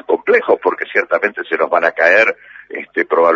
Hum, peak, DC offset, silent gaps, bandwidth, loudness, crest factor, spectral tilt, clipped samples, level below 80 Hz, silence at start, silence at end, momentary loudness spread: none; 0 dBFS; under 0.1%; none; 7.4 kHz; -14 LUFS; 14 dB; -4.5 dB/octave; under 0.1%; -62 dBFS; 0.1 s; 0 s; 12 LU